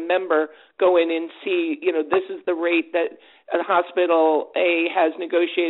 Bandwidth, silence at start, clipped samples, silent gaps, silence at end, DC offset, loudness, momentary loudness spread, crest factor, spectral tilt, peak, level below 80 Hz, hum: 4.1 kHz; 0 s; under 0.1%; none; 0 s; under 0.1%; -21 LUFS; 8 LU; 18 dB; -0.5 dB/octave; -2 dBFS; -72 dBFS; none